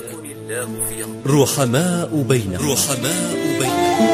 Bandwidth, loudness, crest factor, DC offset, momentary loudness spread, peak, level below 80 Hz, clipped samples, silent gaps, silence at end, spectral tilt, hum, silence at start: 16 kHz; -19 LUFS; 16 dB; under 0.1%; 10 LU; -2 dBFS; -50 dBFS; under 0.1%; none; 0 s; -4.5 dB/octave; none; 0 s